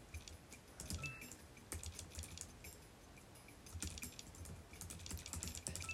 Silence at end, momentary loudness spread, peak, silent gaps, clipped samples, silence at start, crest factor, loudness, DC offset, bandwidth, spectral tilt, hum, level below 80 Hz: 0 s; 12 LU; -24 dBFS; none; under 0.1%; 0 s; 26 dB; -51 LUFS; under 0.1%; 16 kHz; -3 dB/octave; none; -60 dBFS